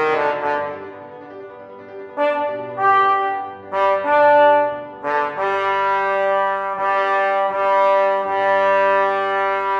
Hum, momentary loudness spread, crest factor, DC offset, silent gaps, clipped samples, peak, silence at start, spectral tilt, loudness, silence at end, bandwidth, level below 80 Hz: none; 20 LU; 14 dB; under 0.1%; none; under 0.1%; -4 dBFS; 0 s; -5 dB/octave; -18 LUFS; 0 s; 7.2 kHz; -68 dBFS